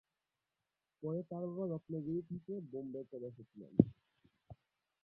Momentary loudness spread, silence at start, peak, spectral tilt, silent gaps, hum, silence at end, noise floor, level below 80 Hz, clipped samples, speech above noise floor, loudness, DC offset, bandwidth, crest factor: 15 LU; 1 s; -10 dBFS; -13.5 dB/octave; none; none; 0.5 s; under -90 dBFS; -68 dBFS; under 0.1%; over 51 dB; -40 LUFS; under 0.1%; 3.7 kHz; 32 dB